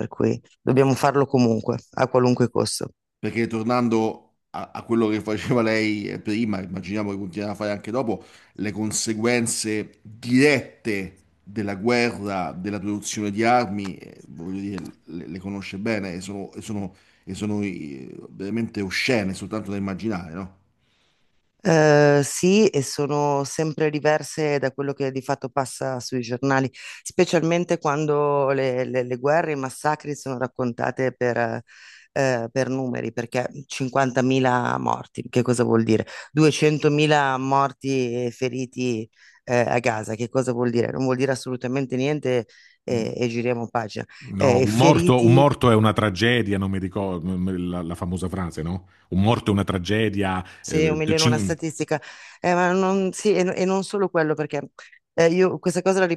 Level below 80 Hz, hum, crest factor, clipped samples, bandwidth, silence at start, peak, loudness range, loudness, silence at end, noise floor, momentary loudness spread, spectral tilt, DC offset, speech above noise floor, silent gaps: -58 dBFS; none; 22 dB; under 0.1%; 12.5 kHz; 0 s; 0 dBFS; 7 LU; -23 LUFS; 0 s; -68 dBFS; 13 LU; -5.5 dB/octave; under 0.1%; 46 dB; none